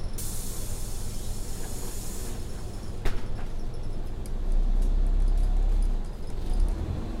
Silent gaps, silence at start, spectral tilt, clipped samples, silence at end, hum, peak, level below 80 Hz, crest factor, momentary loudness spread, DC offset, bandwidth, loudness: none; 0 s; -5 dB/octave; under 0.1%; 0 s; none; -12 dBFS; -26 dBFS; 14 dB; 9 LU; under 0.1%; 16 kHz; -34 LUFS